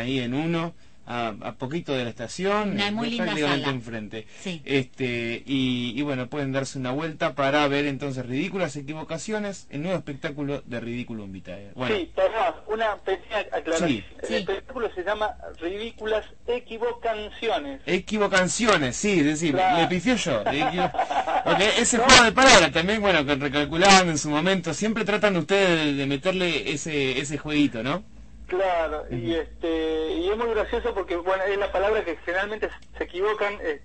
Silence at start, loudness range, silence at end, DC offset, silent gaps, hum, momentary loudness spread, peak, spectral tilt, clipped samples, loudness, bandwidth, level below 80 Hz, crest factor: 0 s; 11 LU; 0.05 s; 0.5%; none; none; 12 LU; -2 dBFS; -3.5 dB/octave; under 0.1%; -24 LUFS; 8.8 kHz; -46 dBFS; 22 dB